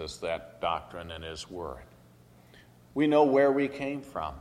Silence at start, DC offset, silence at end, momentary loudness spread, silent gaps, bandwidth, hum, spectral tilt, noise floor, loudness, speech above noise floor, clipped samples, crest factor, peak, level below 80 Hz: 0 s; under 0.1%; 0 s; 17 LU; none; 12.5 kHz; none; -5.5 dB/octave; -57 dBFS; -29 LUFS; 28 dB; under 0.1%; 18 dB; -12 dBFS; -56 dBFS